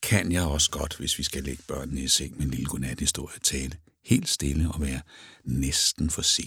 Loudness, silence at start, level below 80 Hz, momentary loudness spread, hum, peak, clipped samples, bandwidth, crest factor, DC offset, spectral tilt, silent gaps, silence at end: -26 LUFS; 0 s; -38 dBFS; 11 LU; none; -6 dBFS; under 0.1%; 18.5 kHz; 20 dB; under 0.1%; -3 dB/octave; none; 0 s